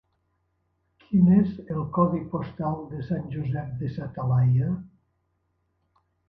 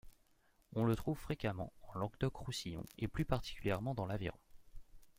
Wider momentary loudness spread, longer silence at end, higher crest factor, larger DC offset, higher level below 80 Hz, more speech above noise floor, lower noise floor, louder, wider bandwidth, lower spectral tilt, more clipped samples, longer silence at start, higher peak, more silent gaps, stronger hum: first, 13 LU vs 9 LU; first, 1.45 s vs 0.1 s; about the same, 20 dB vs 22 dB; neither; about the same, -52 dBFS vs -54 dBFS; first, 49 dB vs 33 dB; about the same, -73 dBFS vs -72 dBFS; first, -26 LUFS vs -41 LUFS; second, 4.8 kHz vs 16.5 kHz; first, -12.5 dB/octave vs -6.5 dB/octave; neither; first, 1.1 s vs 0.05 s; first, -6 dBFS vs -20 dBFS; neither; neither